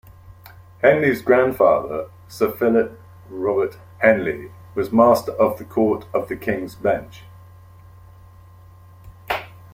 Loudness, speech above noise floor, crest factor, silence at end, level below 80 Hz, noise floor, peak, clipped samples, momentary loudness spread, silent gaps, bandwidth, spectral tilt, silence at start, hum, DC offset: -20 LUFS; 26 dB; 20 dB; 0.25 s; -54 dBFS; -45 dBFS; -2 dBFS; under 0.1%; 13 LU; none; 16.5 kHz; -6.5 dB/octave; 0.1 s; none; under 0.1%